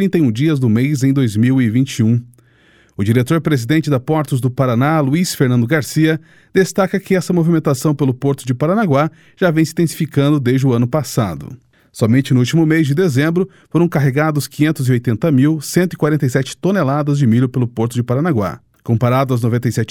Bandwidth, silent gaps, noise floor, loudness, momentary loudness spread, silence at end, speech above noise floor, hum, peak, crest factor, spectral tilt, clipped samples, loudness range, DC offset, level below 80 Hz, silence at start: 17 kHz; none; -51 dBFS; -15 LUFS; 5 LU; 0.05 s; 36 dB; none; 0 dBFS; 14 dB; -7 dB/octave; under 0.1%; 1 LU; under 0.1%; -52 dBFS; 0 s